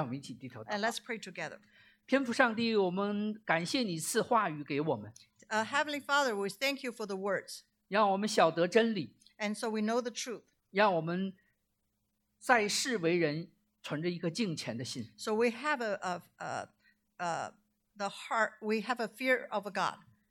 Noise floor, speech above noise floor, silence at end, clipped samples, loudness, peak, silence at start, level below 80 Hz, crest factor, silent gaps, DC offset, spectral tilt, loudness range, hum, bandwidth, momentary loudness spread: -80 dBFS; 48 dB; 0.35 s; under 0.1%; -33 LUFS; -10 dBFS; 0 s; -82 dBFS; 24 dB; none; under 0.1%; -4 dB/octave; 5 LU; none; 17.5 kHz; 13 LU